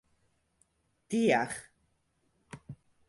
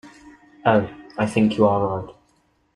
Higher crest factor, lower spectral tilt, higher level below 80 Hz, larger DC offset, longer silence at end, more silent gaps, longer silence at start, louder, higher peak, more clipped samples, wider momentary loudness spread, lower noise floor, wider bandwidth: about the same, 22 dB vs 18 dB; second, -5 dB/octave vs -7 dB/octave; second, -70 dBFS vs -54 dBFS; neither; second, 0.35 s vs 0.65 s; neither; first, 1.1 s vs 0.05 s; second, -30 LUFS vs -21 LUFS; second, -14 dBFS vs -4 dBFS; neither; first, 25 LU vs 13 LU; first, -75 dBFS vs -63 dBFS; about the same, 11.5 kHz vs 11 kHz